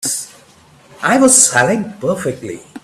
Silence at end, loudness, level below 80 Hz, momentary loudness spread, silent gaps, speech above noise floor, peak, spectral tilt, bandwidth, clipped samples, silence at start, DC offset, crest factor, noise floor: 0.05 s; -13 LUFS; -56 dBFS; 20 LU; none; 32 dB; 0 dBFS; -2.5 dB/octave; over 20 kHz; under 0.1%; 0 s; under 0.1%; 16 dB; -46 dBFS